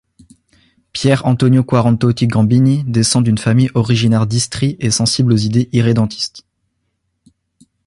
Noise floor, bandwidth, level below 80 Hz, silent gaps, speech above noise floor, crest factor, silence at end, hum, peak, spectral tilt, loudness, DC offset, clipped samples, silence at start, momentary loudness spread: -69 dBFS; 11.5 kHz; -44 dBFS; none; 56 dB; 14 dB; 1.5 s; none; 0 dBFS; -5.5 dB/octave; -14 LUFS; under 0.1%; under 0.1%; 0.95 s; 5 LU